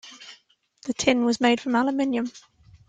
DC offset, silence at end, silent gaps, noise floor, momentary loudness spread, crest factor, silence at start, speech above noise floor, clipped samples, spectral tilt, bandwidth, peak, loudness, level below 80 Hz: under 0.1%; 0.5 s; none; -59 dBFS; 21 LU; 20 dB; 0.05 s; 36 dB; under 0.1%; -3.5 dB/octave; 9.2 kHz; -6 dBFS; -23 LUFS; -62 dBFS